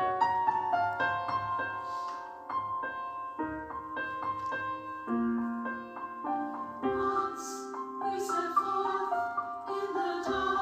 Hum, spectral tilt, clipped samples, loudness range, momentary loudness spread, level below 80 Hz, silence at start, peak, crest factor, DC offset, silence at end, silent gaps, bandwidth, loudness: none; -4.5 dB/octave; under 0.1%; 4 LU; 9 LU; -64 dBFS; 0 s; -16 dBFS; 18 dB; under 0.1%; 0 s; none; 15.5 kHz; -33 LUFS